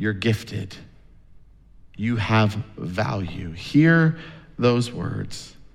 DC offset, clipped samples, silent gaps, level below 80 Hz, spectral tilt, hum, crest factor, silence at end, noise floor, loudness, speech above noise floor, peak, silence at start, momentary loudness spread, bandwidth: under 0.1%; under 0.1%; none; -50 dBFS; -7 dB/octave; none; 18 dB; 0.1 s; -48 dBFS; -23 LUFS; 26 dB; -6 dBFS; 0 s; 18 LU; 12.5 kHz